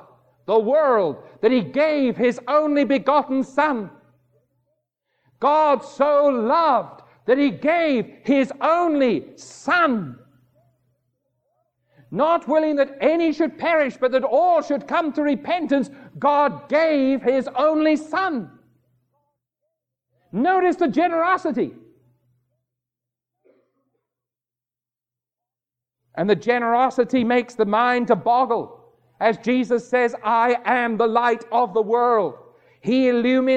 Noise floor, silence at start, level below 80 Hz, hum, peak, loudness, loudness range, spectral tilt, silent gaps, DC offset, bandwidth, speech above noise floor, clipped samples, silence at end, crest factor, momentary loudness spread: under -90 dBFS; 0.5 s; -68 dBFS; none; -4 dBFS; -20 LUFS; 5 LU; -6 dB/octave; none; under 0.1%; 8.8 kHz; over 71 dB; under 0.1%; 0 s; 16 dB; 7 LU